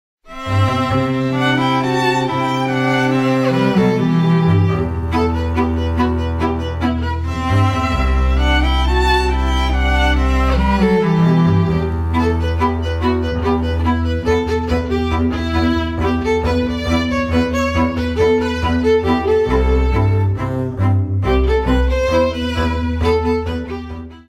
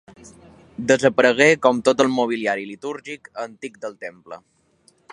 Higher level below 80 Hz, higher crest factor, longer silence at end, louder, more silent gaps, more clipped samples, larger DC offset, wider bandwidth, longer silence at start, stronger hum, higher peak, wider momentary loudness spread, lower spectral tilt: first, -22 dBFS vs -62 dBFS; second, 12 dB vs 20 dB; second, 0.05 s vs 0.75 s; about the same, -16 LUFS vs -18 LUFS; neither; neither; neither; about the same, 12 kHz vs 11 kHz; second, 0.25 s vs 0.8 s; neither; second, -4 dBFS vs 0 dBFS; second, 5 LU vs 22 LU; first, -7 dB/octave vs -4 dB/octave